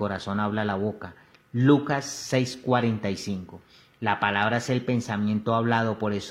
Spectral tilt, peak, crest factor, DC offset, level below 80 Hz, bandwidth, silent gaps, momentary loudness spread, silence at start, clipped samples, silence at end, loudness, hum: -6 dB/octave; -8 dBFS; 18 dB; under 0.1%; -62 dBFS; 14 kHz; none; 10 LU; 0 s; under 0.1%; 0 s; -26 LUFS; none